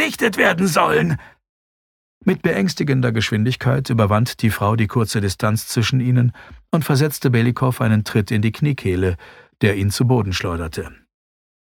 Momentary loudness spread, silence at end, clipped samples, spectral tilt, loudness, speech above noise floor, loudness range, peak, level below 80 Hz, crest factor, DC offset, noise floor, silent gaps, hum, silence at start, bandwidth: 7 LU; 0.75 s; under 0.1%; -6 dB/octave; -19 LUFS; over 72 dB; 2 LU; -2 dBFS; -46 dBFS; 18 dB; under 0.1%; under -90 dBFS; 1.49-2.21 s; none; 0 s; 18.5 kHz